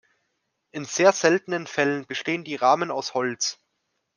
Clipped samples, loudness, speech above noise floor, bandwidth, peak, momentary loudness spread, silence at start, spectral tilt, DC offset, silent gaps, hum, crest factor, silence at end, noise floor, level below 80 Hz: under 0.1%; -23 LUFS; 53 dB; 10.5 kHz; -2 dBFS; 9 LU; 0.75 s; -3 dB/octave; under 0.1%; none; none; 22 dB; 0.65 s; -76 dBFS; -78 dBFS